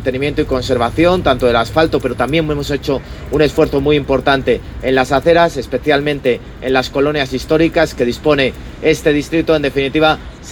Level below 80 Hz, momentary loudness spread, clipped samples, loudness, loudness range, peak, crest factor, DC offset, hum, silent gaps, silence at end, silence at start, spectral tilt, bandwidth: -32 dBFS; 6 LU; under 0.1%; -15 LUFS; 1 LU; 0 dBFS; 14 dB; under 0.1%; none; none; 0 s; 0 s; -5.5 dB/octave; 18 kHz